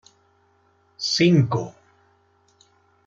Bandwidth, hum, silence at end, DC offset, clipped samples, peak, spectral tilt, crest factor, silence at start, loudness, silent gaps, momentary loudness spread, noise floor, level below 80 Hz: 7.6 kHz; none; 1.35 s; under 0.1%; under 0.1%; -6 dBFS; -5.5 dB/octave; 20 dB; 1 s; -20 LUFS; none; 13 LU; -62 dBFS; -64 dBFS